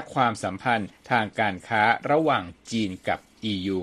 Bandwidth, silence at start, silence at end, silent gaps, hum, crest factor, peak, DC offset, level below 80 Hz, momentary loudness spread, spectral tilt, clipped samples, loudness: 12.5 kHz; 0 s; 0 s; none; none; 20 dB; -6 dBFS; under 0.1%; -60 dBFS; 8 LU; -5 dB/octave; under 0.1%; -25 LUFS